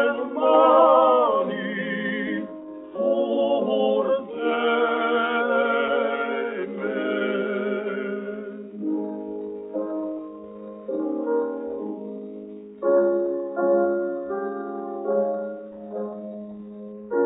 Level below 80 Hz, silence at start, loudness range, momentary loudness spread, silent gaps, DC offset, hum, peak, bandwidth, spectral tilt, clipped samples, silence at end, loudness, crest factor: -70 dBFS; 0 s; 8 LU; 16 LU; none; under 0.1%; none; -4 dBFS; 3.9 kHz; -3.5 dB/octave; under 0.1%; 0 s; -24 LUFS; 20 dB